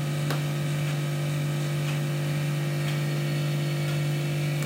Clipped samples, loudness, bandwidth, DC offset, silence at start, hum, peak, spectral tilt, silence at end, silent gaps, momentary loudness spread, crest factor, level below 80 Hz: under 0.1%; -28 LUFS; 16 kHz; under 0.1%; 0 s; none; -14 dBFS; -6 dB/octave; 0 s; none; 1 LU; 12 dB; -62 dBFS